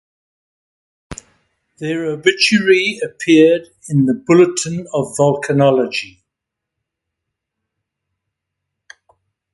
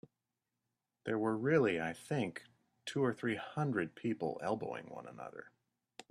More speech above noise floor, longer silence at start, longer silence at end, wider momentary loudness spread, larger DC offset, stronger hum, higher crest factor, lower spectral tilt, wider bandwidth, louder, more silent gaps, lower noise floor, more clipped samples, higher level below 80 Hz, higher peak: first, 66 dB vs 53 dB; about the same, 1.1 s vs 1.05 s; first, 3.5 s vs 0.1 s; about the same, 17 LU vs 18 LU; neither; neither; about the same, 18 dB vs 20 dB; second, -5 dB/octave vs -6.5 dB/octave; second, 11.5 kHz vs 13.5 kHz; first, -15 LUFS vs -37 LUFS; neither; second, -81 dBFS vs -89 dBFS; neither; first, -54 dBFS vs -76 dBFS; first, 0 dBFS vs -18 dBFS